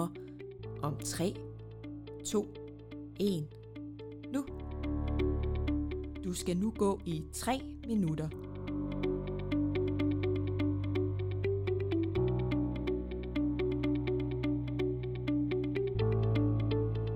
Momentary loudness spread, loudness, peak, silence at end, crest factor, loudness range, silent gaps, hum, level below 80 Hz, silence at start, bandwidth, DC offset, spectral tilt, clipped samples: 13 LU; -34 LUFS; -20 dBFS; 0 s; 14 dB; 5 LU; none; none; -44 dBFS; 0 s; 16.5 kHz; under 0.1%; -7 dB/octave; under 0.1%